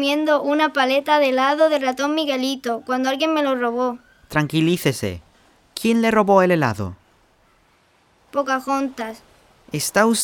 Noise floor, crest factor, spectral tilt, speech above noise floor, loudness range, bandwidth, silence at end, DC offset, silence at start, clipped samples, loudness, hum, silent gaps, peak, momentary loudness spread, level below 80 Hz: -58 dBFS; 18 dB; -4.5 dB/octave; 39 dB; 5 LU; 19 kHz; 0 s; under 0.1%; 0 s; under 0.1%; -19 LUFS; none; none; -2 dBFS; 12 LU; -56 dBFS